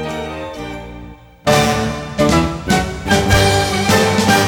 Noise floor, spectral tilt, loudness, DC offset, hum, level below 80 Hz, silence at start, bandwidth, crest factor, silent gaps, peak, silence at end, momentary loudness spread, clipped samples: -36 dBFS; -4.5 dB/octave; -15 LUFS; under 0.1%; none; -30 dBFS; 0 s; over 20 kHz; 16 dB; none; 0 dBFS; 0 s; 16 LU; under 0.1%